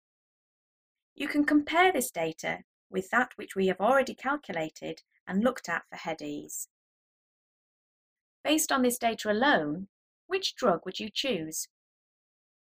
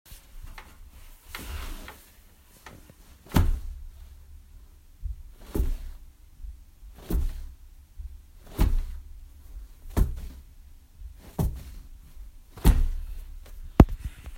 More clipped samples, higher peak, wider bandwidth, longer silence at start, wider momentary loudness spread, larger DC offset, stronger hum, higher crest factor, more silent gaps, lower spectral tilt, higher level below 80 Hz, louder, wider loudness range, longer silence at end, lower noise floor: neither; second, -10 dBFS vs 0 dBFS; about the same, 16 kHz vs 16 kHz; first, 1.2 s vs 0.1 s; second, 14 LU vs 25 LU; neither; neither; second, 20 dB vs 30 dB; first, 2.64-2.90 s, 5.20-5.26 s, 6.70-8.44 s, 9.89-10.29 s vs none; second, -3.5 dB/octave vs -7 dB/octave; second, -68 dBFS vs -32 dBFS; about the same, -29 LUFS vs -29 LUFS; about the same, 7 LU vs 7 LU; first, 1.15 s vs 0 s; first, under -90 dBFS vs -54 dBFS